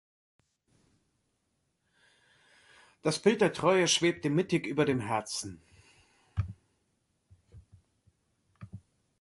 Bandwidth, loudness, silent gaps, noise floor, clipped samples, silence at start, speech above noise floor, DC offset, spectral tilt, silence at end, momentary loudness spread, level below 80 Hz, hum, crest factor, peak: 11.5 kHz; -29 LUFS; none; -78 dBFS; under 0.1%; 3.05 s; 50 dB; under 0.1%; -4 dB/octave; 0.4 s; 18 LU; -56 dBFS; none; 22 dB; -12 dBFS